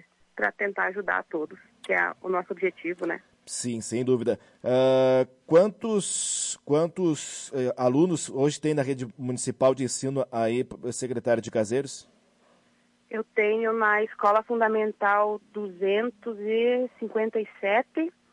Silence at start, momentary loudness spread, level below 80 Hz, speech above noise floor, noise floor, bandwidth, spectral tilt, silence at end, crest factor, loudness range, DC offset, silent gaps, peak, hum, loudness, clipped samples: 0.35 s; 10 LU; -72 dBFS; 39 dB; -65 dBFS; 11.5 kHz; -4.5 dB/octave; 0.25 s; 16 dB; 5 LU; under 0.1%; none; -10 dBFS; none; -26 LUFS; under 0.1%